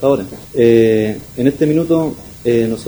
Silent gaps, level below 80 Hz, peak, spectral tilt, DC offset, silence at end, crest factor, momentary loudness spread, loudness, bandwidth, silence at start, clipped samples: none; -44 dBFS; 0 dBFS; -7.5 dB/octave; under 0.1%; 0 s; 14 dB; 11 LU; -15 LUFS; over 20 kHz; 0 s; under 0.1%